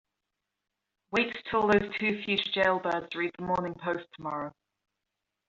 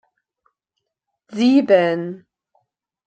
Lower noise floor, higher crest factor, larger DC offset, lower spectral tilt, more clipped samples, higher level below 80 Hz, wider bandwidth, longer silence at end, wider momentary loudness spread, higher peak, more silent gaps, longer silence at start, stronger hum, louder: first, -86 dBFS vs -79 dBFS; about the same, 22 dB vs 20 dB; neither; second, -2.5 dB/octave vs -6.5 dB/octave; neither; first, -62 dBFS vs -72 dBFS; second, 7.6 kHz vs 8.4 kHz; about the same, 1 s vs 0.9 s; second, 10 LU vs 19 LU; second, -10 dBFS vs -2 dBFS; neither; second, 1.1 s vs 1.3 s; neither; second, -29 LUFS vs -16 LUFS